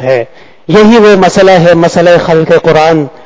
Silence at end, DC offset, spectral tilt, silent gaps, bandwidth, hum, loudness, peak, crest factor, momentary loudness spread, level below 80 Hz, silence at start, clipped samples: 0.15 s; under 0.1%; -6 dB/octave; none; 8 kHz; none; -5 LUFS; 0 dBFS; 6 dB; 7 LU; -38 dBFS; 0 s; 6%